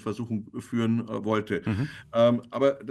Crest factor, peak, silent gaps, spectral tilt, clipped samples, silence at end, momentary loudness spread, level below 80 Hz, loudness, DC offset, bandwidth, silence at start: 16 dB; -10 dBFS; none; -7.5 dB/octave; under 0.1%; 0 s; 10 LU; -62 dBFS; -27 LUFS; under 0.1%; 12 kHz; 0.05 s